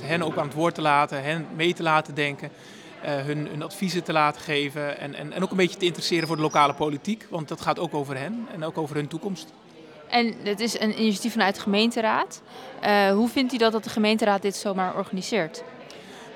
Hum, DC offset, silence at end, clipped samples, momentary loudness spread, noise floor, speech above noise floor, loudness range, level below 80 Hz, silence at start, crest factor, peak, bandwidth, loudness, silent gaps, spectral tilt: none; under 0.1%; 0 s; under 0.1%; 12 LU; -47 dBFS; 22 dB; 5 LU; -70 dBFS; 0 s; 22 dB; -4 dBFS; 17.5 kHz; -25 LUFS; none; -4.5 dB/octave